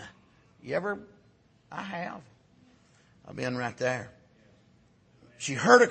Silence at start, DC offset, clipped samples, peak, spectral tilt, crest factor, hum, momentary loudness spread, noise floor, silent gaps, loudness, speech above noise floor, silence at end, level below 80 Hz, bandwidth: 0 s; under 0.1%; under 0.1%; -2 dBFS; -4 dB/octave; 28 dB; none; 22 LU; -63 dBFS; none; -30 LUFS; 36 dB; 0 s; -70 dBFS; 8.8 kHz